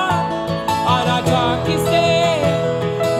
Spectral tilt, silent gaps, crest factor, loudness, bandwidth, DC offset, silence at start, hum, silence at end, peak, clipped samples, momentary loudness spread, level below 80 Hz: -5.5 dB/octave; none; 14 dB; -17 LUFS; 16 kHz; under 0.1%; 0 s; none; 0 s; -4 dBFS; under 0.1%; 5 LU; -44 dBFS